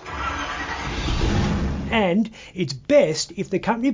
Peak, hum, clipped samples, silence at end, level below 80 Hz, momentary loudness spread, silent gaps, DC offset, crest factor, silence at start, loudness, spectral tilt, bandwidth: -6 dBFS; none; under 0.1%; 0 s; -32 dBFS; 10 LU; none; under 0.1%; 16 dB; 0 s; -23 LUFS; -5.5 dB/octave; 7.6 kHz